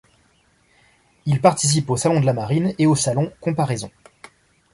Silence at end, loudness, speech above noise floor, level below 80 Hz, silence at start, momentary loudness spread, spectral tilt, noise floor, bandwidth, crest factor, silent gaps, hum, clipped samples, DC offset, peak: 0.85 s; -20 LUFS; 41 dB; -54 dBFS; 1.25 s; 8 LU; -5.5 dB/octave; -60 dBFS; 11.5 kHz; 18 dB; none; none; under 0.1%; under 0.1%; -2 dBFS